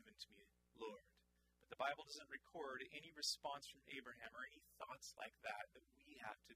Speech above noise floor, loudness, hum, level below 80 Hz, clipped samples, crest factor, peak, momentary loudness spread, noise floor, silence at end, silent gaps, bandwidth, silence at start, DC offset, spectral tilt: 27 dB; -52 LUFS; none; -84 dBFS; under 0.1%; 24 dB; -30 dBFS; 14 LU; -81 dBFS; 0 s; none; 15.5 kHz; 0 s; under 0.1%; -1 dB/octave